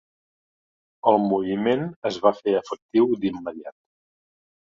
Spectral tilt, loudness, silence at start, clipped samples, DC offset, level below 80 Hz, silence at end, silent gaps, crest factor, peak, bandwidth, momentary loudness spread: -7 dB/octave; -23 LUFS; 1.05 s; under 0.1%; under 0.1%; -64 dBFS; 0.95 s; 1.96-2.02 s, 2.82-2.89 s; 22 dB; -2 dBFS; 7.4 kHz; 13 LU